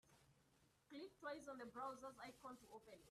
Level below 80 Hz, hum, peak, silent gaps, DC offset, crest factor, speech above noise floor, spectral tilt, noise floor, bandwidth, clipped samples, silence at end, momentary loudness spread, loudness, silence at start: -84 dBFS; none; -38 dBFS; none; under 0.1%; 18 dB; 23 dB; -4 dB/octave; -79 dBFS; 14 kHz; under 0.1%; 0 s; 10 LU; -56 LUFS; 0.05 s